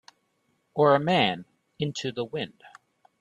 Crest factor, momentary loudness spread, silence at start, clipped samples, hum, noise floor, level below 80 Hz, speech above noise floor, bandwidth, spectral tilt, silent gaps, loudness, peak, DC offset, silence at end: 20 dB; 15 LU; 0.75 s; under 0.1%; none; -72 dBFS; -68 dBFS; 47 dB; 10 kHz; -5.5 dB/octave; none; -26 LUFS; -8 dBFS; under 0.1%; 0.5 s